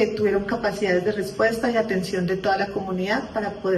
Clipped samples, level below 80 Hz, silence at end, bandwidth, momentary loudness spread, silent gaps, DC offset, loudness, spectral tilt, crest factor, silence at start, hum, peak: under 0.1%; -50 dBFS; 0 s; 13 kHz; 5 LU; none; under 0.1%; -23 LUFS; -6 dB/octave; 14 dB; 0 s; none; -8 dBFS